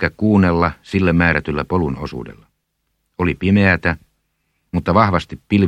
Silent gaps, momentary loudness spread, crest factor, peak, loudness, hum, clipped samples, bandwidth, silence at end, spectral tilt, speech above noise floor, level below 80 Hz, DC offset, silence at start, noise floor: none; 14 LU; 18 dB; 0 dBFS; -17 LUFS; none; under 0.1%; 8.6 kHz; 0 s; -8 dB/octave; 54 dB; -38 dBFS; under 0.1%; 0 s; -71 dBFS